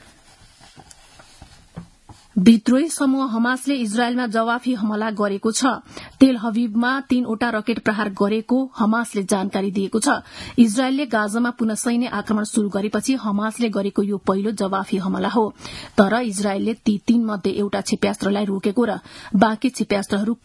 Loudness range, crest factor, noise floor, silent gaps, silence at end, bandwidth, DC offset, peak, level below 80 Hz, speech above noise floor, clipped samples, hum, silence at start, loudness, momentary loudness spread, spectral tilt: 2 LU; 20 dB; -50 dBFS; none; 0.1 s; 12 kHz; under 0.1%; 0 dBFS; -54 dBFS; 30 dB; under 0.1%; none; 0.75 s; -20 LUFS; 6 LU; -5 dB/octave